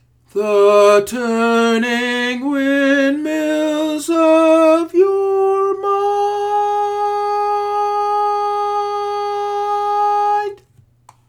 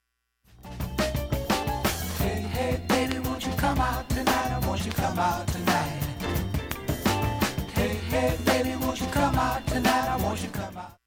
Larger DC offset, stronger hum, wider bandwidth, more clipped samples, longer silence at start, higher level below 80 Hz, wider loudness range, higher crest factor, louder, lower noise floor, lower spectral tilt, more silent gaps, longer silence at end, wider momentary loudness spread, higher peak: neither; neither; about the same, 16.5 kHz vs 17.5 kHz; neither; second, 0.35 s vs 0.6 s; second, -60 dBFS vs -36 dBFS; about the same, 4 LU vs 2 LU; second, 14 dB vs 20 dB; first, -16 LUFS vs -27 LUFS; second, -51 dBFS vs -67 dBFS; about the same, -4 dB/octave vs -5 dB/octave; neither; first, 0.75 s vs 0.15 s; about the same, 8 LU vs 7 LU; first, -2 dBFS vs -8 dBFS